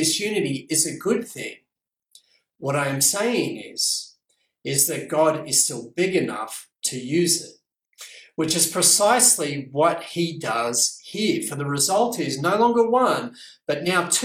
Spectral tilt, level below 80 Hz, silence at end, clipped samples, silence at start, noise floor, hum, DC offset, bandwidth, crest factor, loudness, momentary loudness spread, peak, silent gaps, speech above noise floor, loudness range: -2.5 dB/octave; -68 dBFS; 0 s; under 0.1%; 0 s; -76 dBFS; none; under 0.1%; 17 kHz; 20 dB; -21 LUFS; 15 LU; -2 dBFS; none; 54 dB; 5 LU